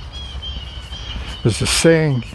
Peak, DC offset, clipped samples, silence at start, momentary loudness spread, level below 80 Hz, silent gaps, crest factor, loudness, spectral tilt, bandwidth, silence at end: -2 dBFS; under 0.1%; under 0.1%; 0 s; 17 LU; -32 dBFS; none; 16 dB; -18 LUFS; -4.5 dB/octave; 13 kHz; 0 s